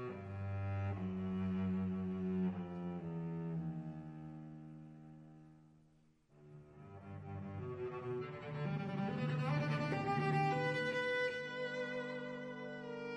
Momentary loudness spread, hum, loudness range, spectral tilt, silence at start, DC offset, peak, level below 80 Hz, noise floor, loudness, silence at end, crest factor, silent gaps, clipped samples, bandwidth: 19 LU; none; 15 LU; -7.5 dB/octave; 0 s; under 0.1%; -24 dBFS; -72 dBFS; -70 dBFS; -40 LUFS; 0 s; 16 dB; none; under 0.1%; 9.6 kHz